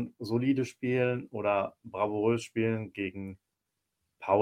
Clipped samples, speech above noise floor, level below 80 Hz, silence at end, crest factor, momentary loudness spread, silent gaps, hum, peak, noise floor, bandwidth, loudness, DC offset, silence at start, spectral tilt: under 0.1%; 54 dB; -70 dBFS; 0 s; 20 dB; 8 LU; none; none; -12 dBFS; -85 dBFS; 14 kHz; -31 LUFS; under 0.1%; 0 s; -7 dB/octave